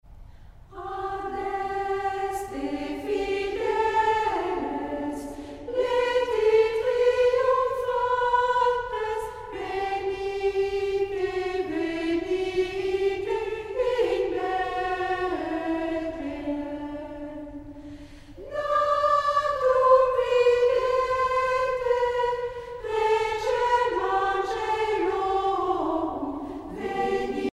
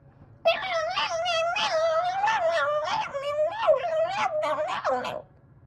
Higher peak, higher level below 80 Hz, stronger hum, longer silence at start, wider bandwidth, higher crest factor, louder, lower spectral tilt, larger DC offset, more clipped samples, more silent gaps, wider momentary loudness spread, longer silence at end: first, -6 dBFS vs -12 dBFS; first, -50 dBFS vs -64 dBFS; neither; second, 0.05 s vs 0.2 s; first, 13 kHz vs 11 kHz; about the same, 18 dB vs 16 dB; about the same, -26 LUFS vs -26 LUFS; first, -5 dB/octave vs -2 dB/octave; neither; neither; neither; first, 12 LU vs 5 LU; second, 0.05 s vs 0.4 s